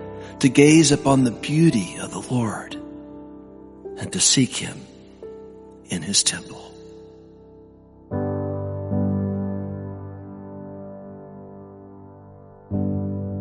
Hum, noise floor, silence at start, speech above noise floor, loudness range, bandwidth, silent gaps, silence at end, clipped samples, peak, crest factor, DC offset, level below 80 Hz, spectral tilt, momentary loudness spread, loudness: none; -48 dBFS; 0 s; 29 dB; 13 LU; 11.5 kHz; none; 0 s; under 0.1%; -2 dBFS; 22 dB; under 0.1%; -54 dBFS; -4.5 dB/octave; 25 LU; -21 LUFS